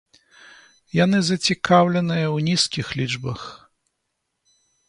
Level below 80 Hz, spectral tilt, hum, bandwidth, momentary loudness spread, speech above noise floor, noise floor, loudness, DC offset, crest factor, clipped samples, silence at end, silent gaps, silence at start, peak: -56 dBFS; -5 dB/octave; none; 11.5 kHz; 12 LU; 57 dB; -77 dBFS; -20 LUFS; under 0.1%; 20 dB; under 0.1%; 1.35 s; none; 0.95 s; -2 dBFS